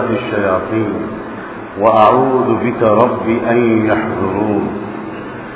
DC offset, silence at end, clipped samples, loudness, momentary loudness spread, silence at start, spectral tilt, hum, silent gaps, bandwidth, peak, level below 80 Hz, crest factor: under 0.1%; 0 s; 0.1%; -14 LUFS; 16 LU; 0 s; -11 dB/octave; none; none; 4 kHz; 0 dBFS; -44 dBFS; 14 dB